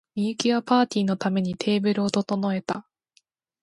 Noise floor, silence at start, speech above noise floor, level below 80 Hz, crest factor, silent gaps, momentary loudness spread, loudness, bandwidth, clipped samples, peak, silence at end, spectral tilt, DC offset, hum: -66 dBFS; 0.15 s; 43 dB; -66 dBFS; 18 dB; none; 8 LU; -24 LUFS; 11.5 kHz; under 0.1%; -6 dBFS; 0.8 s; -5.5 dB/octave; under 0.1%; none